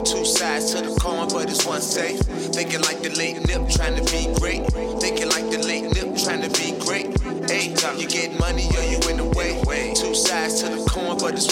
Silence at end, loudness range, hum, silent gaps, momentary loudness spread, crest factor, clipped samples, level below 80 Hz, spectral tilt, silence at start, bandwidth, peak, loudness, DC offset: 0 s; 1 LU; none; none; 4 LU; 18 dB; under 0.1%; -28 dBFS; -3 dB/octave; 0 s; 16.5 kHz; -4 dBFS; -22 LUFS; under 0.1%